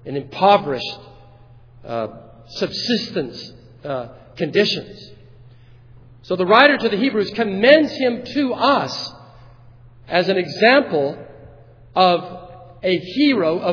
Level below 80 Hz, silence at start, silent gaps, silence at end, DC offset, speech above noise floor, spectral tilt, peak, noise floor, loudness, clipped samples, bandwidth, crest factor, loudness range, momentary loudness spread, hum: -54 dBFS; 0.05 s; none; 0 s; under 0.1%; 28 dB; -5.5 dB/octave; 0 dBFS; -45 dBFS; -18 LUFS; under 0.1%; 5.4 kHz; 20 dB; 9 LU; 18 LU; none